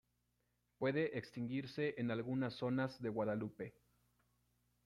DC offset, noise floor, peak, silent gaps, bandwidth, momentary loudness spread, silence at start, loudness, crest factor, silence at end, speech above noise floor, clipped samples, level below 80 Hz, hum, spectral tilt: under 0.1%; -83 dBFS; -26 dBFS; none; 11.5 kHz; 6 LU; 0.8 s; -41 LUFS; 16 dB; 1.15 s; 42 dB; under 0.1%; -76 dBFS; 60 Hz at -65 dBFS; -8 dB/octave